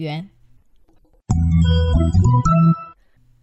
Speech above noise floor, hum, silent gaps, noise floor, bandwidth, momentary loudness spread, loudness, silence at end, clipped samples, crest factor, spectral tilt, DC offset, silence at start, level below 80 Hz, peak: 38 dB; none; none; -54 dBFS; 8.2 kHz; 10 LU; -17 LUFS; 0.55 s; under 0.1%; 12 dB; -8 dB/octave; under 0.1%; 0 s; -28 dBFS; -6 dBFS